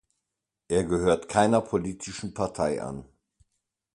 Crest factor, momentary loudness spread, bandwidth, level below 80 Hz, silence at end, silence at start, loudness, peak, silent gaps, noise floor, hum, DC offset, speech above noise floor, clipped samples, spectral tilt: 22 dB; 13 LU; 11.5 kHz; -50 dBFS; 0.9 s; 0.7 s; -27 LUFS; -6 dBFS; none; -85 dBFS; none; under 0.1%; 59 dB; under 0.1%; -5.5 dB/octave